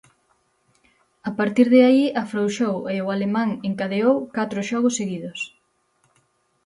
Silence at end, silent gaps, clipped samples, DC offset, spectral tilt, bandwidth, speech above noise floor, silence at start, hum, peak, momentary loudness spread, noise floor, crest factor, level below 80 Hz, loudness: 1.2 s; none; under 0.1%; under 0.1%; -5.5 dB/octave; 11 kHz; 46 dB; 1.25 s; none; -4 dBFS; 15 LU; -66 dBFS; 18 dB; -66 dBFS; -21 LUFS